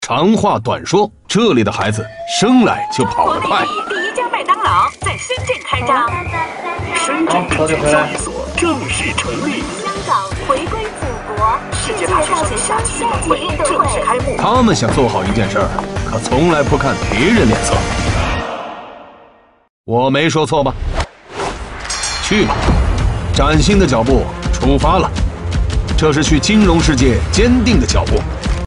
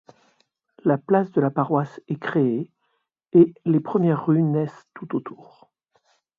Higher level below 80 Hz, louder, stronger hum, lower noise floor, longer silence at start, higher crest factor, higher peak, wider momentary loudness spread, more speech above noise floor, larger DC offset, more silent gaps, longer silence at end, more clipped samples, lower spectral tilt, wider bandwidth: first, -24 dBFS vs -68 dBFS; first, -15 LUFS vs -22 LUFS; neither; second, -46 dBFS vs -73 dBFS; second, 0 s vs 0.85 s; second, 14 dB vs 20 dB; first, 0 dBFS vs -4 dBFS; second, 9 LU vs 13 LU; second, 32 dB vs 52 dB; neither; first, 19.70-19.84 s vs none; second, 0 s vs 1.05 s; neither; second, -5 dB/octave vs -10.5 dB/octave; first, 11 kHz vs 4.9 kHz